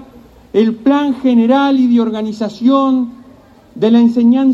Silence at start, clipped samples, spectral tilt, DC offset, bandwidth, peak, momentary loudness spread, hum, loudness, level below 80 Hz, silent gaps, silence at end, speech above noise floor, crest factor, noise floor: 0 s; under 0.1%; -7 dB/octave; under 0.1%; 7.2 kHz; 0 dBFS; 8 LU; none; -13 LUFS; -54 dBFS; none; 0 s; 31 dB; 12 dB; -42 dBFS